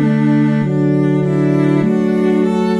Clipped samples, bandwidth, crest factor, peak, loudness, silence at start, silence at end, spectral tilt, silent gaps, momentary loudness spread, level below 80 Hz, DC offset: under 0.1%; 9.4 kHz; 10 dB; -2 dBFS; -14 LUFS; 0 s; 0 s; -9 dB/octave; none; 1 LU; -58 dBFS; 0.5%